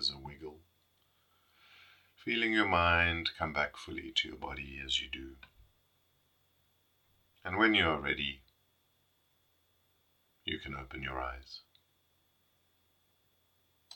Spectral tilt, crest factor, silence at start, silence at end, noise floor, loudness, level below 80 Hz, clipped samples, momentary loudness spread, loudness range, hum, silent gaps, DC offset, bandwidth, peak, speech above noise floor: -4.5 dB/octave; 24 dB; 0 s; 0 s; -74 dBFS; -32 LUFS; -58 dBFS; under 0.1%; 21 LU; 12 LU; none; none; under 0.1%; 18 kHz; -14 dBFS; 41 dB